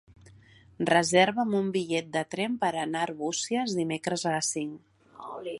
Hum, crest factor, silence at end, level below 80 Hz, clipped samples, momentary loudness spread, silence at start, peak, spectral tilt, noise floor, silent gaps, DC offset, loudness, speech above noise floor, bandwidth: none; 22 dB; 0 s; -68 dBFS; under 0.1%; 11 LU; 0.1 s; -6 dBFS; -3.5 dB/octave; -55 dBFS; none; under 0.1%; -28 LUFS; 28 dB; 11.5 kHz